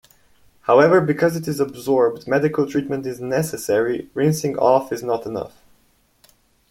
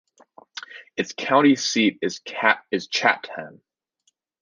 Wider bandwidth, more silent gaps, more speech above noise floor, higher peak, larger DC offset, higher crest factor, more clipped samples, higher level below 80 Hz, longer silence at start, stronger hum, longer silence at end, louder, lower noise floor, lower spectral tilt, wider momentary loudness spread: first, 16.5 kHz vs 9.8 kHz; neither; second, 41 dB vs 48 dB; about the same, -2 dBFS vs -2 dBFS; neither; about the same, 18 dB vs 22 dB; neither; first, -58 dBFS vs -72 dBFS; about the same, 0.65 s vs 0.55 s; neither; first, 1.2 s vs 0.9 s; about the same, -20 LUFS vs -21 LUFS; second, -60 dBFS vs -70 dBFS; first, -6 dB/octave vs -3.5 dB/octave; second, 11 LU vs 20 LU